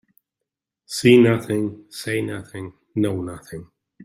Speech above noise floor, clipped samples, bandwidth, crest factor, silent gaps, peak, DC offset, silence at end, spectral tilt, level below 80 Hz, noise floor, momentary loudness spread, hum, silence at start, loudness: 64 dB; under 0.1%; 15.5 kHz; 20 dB; none; -2 dBFS; under 0.1%; 0 s; -6 dB/octave; -60 dBFS; -84 dBFS; 22 LU; none; 0.9 s; -20 LUFS